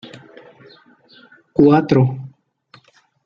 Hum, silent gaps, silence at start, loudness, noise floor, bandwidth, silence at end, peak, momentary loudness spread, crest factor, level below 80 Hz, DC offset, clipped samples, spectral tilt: none; none; 0.05 s; -15 LUFS; -54 dBFS; 6.8 kHz; 0.95 s; -2 dBFS; 26 LU; 18 dB; -54 dBFS; under 0.1%; under 0.1%; -9.5 dB/octave